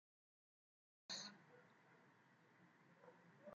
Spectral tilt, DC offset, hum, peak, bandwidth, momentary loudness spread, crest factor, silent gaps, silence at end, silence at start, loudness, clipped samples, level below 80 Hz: -1 dB/octave; under 0.1%; none; -40 dBFS; 7.4 kHz; 17 LU; 24 dB; none; 0 s; 1.1 s; -54 LUFS; under 0.1%; under -90 dBFS